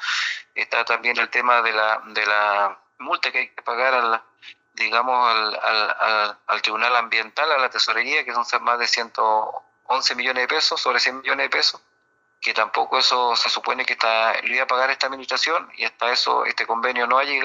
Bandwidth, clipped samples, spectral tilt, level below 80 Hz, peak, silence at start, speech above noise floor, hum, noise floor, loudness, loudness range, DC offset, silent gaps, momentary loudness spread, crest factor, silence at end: 8 kHz; under 0.1%; 0.5 dB/octave; -78 dBFS; -4 dBFS; 0 s; 44 dB; none; -65 dBFS; -20 LUFS; 1 LU; under 0.1%; none; 6 LU; 18 dB; 0 s